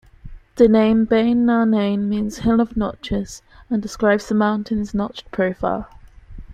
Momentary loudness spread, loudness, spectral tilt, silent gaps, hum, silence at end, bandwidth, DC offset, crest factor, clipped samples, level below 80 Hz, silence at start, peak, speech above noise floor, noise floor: 11 LU; -19 LUFS; -6.5 dB/octave; none; none; 0 s; 9.4 kHz; under 0.1%; 16 dB; under 0.1%; -40 dBFS; 0.25 s; -2 dBFS; 20 dB; -38 dBFS